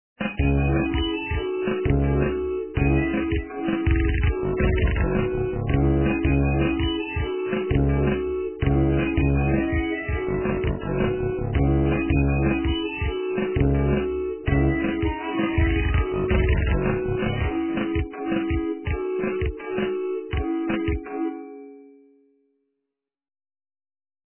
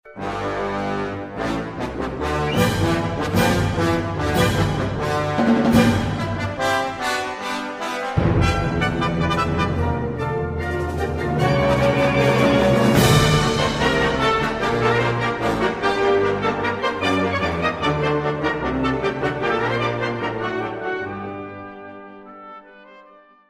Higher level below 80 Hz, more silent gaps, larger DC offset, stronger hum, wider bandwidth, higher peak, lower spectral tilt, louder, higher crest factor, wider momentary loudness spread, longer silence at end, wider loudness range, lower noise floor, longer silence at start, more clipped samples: first, -28 dBFS vs -36 dBFS; neither; neither; neither; second, 3.2 kHz vs 15 kHz; second, -8 dBFS vs -2 dBFS; first, -11.5 dB/octave vs -5.5 dB/octave; second, -24 LUFS vs -20 LUFS; about the same, 16 dB vs 18 dB; second, 6 LU vs 10 LU; first, 2.45 s vs 0.45 s; about the same, 5 LU vs 6 LU; first, -83 dBFS vs -49 dBFS; first, 0.2 s vs 0.05 s; neither